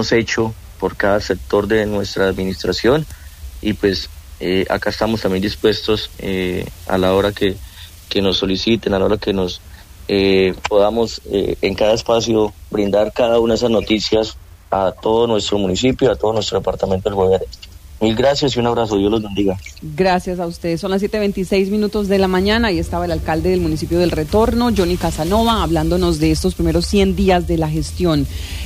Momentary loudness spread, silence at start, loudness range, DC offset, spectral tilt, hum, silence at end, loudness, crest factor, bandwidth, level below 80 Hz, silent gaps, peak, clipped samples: 8 LU; 0 s; 3 LU; under 0.1%; -5.5 dB/octave; none; 0 s; -17 LUFS; 14 dB; 15.5 kHz; -32 dBFS; none; -4 dBFS; under 0.1%